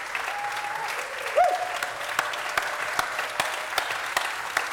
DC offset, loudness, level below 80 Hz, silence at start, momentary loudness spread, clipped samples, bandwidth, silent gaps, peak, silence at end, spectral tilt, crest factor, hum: under 0.1%; -27 LUFS; -64 dBFS; 0 s; 6 LU; under 0.1%; 19 kHz; none; -8 dBFS; 0 s; -0.5 dB/octave; 20 dB; none